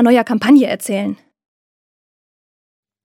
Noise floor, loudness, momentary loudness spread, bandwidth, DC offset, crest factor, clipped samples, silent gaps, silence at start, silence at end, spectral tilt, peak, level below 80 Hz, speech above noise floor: under -90 dBFS; -14 LUFS; 13 LU; 15.5 kHz; under 0.1%; 16 dB; under 0.1%; none; 0 s; 1.9 s; -5 dB/octave; 0 dBFS; -66 dBFS; over 77 dB